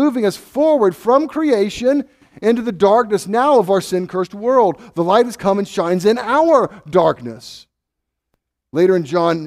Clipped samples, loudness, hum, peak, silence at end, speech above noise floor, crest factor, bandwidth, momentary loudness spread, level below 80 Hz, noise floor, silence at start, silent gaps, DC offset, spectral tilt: under 0.1%; -16 LUFS; none; 0 dBFS; 0 s; 63 dB; 16 dB; 15 kHz; 7 LU; -56 dBFS; -78 dBFS; 0 s; none; under 0.1%; -6 dB/octave